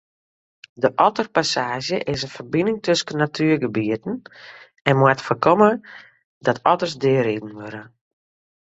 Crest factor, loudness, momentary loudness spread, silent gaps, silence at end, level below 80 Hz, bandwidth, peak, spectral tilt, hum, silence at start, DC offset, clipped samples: 22 dB; -20 LUFS; 13 LU; 4.81-4.85 s, 6.24-6.41 s; 0.9 s; -58 dBFS; 8.2 kHz; 0 dBFS; -5.5 dB/octave; none; 0.8 s; under 0.1%; under 0.1%